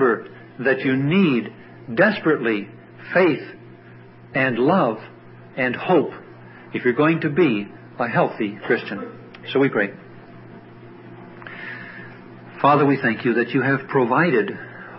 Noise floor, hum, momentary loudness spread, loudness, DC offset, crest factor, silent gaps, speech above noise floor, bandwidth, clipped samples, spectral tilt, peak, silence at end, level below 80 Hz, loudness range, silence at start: -44 dBFS; none; 21 LU; -20 LUFS; under 0.1%; 18 dB; none; 24 dB; 5.8 kHz; under 0.1%; -11.5 dB/octave; -4 dBFS; 0 s; -64 dBFS; 6 LU; 0 s